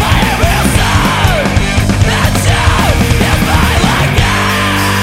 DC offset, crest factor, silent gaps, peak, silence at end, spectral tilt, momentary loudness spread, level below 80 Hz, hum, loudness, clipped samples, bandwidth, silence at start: under 0.1%; 10 dB; none; 0 dBFS; 0 s; -4.5 dB/octave; 1 LU; -18 dBFS; none; -10 LUFS; under 0.1%; 16.5 kHz; 0 s